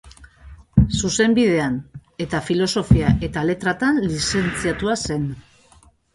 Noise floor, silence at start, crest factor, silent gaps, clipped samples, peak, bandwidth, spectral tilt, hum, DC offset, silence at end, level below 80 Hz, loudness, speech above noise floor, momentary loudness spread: -53 dBFS; 0.05 s; 20 dB; none; under 0.1%; 0 dBFS; 11.5 kHz; -5.5 dB/octave; none; under 0.1%; 0.75 s; -34 dBFS; -20 LUFS; 34 dB; 10 LU